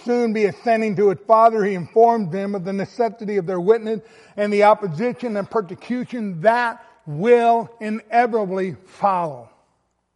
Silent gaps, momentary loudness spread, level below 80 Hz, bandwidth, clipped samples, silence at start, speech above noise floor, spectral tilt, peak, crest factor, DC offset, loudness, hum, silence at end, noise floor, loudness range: none; 12 LU; -70 dBFS; 11 kHz; under 0.1%; 0.05 s; 49 dB; -7 dB/octave; -4 dBFS; 16 dB; under 0.1%; -20 LUFS; none; 0.7 s; -68 dBFS; 2 LU